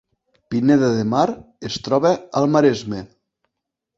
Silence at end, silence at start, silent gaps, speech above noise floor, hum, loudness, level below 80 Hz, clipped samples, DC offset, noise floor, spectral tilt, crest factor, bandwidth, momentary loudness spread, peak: 0.95 s; 0.5 s; none; 63 dB; none; -19 LUFS; -56 dBFS; under 0.1%; under 0.1%; -81 dBFS; -6.5 dB/octave; 18 dB; 7.8 kHz; 13 LU; -2 dBFS